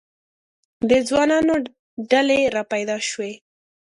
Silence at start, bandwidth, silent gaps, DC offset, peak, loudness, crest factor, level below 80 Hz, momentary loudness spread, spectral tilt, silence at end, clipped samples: 0.8 s; 11.5 kHz; 1.79-1.97 s; under 0.1%; -4 dBFS; -20 LUFS; 18 dB; -56 dBFS; 13 LU; -3.5 dB/octave; 0.6 s; under 0.1%